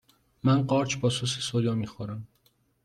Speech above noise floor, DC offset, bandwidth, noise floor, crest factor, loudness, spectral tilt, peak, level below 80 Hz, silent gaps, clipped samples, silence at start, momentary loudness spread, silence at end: 41 dB; under 0.1%; 12 kHz; -68 dBFS; 18 dB; -27 LUFS; -5.5 dB/octave; -12 dBFS; -62 dBFS; none; under 0.1%; 0.45 s; 14 LU; 0.6 s